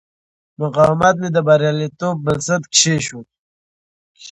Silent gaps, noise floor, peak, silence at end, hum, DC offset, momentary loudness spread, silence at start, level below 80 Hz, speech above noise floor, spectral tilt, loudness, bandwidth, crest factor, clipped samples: 3.39-4.15 s; under -90 dBFS; 0 dBFS; 0 s; none; under 0.1%; 9 LU; 0.6 s; -50 dBFS; over 74 dB; -4 dB/octave; -16 LUFS; 10.5 kHz; 18 dB; under 0.1%